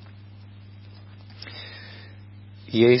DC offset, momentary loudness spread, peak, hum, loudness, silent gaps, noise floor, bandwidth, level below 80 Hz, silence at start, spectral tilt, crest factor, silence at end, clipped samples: under 0.1%; 23 LU; -6 dBFS; 60 Hz at -60 dBFS; -25 LUFS; none; -44 dBFS; 5.8 kHz; -58 dBFS; 1.45 s; -10.5 dB/octave; 22 dB; 0 s; under 0.1%